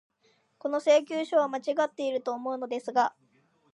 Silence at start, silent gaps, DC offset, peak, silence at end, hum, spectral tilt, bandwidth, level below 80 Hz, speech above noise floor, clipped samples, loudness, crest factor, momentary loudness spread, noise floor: 0.65 s; none; under 0.1%; -12 dBFS; 0.65 s; none; -3 dB/octave; 10.5 kHz; -88 dBFS; 41 dB; under 0.1%; -28 LUFS; 18 dB; 9 LU; -69 dBFS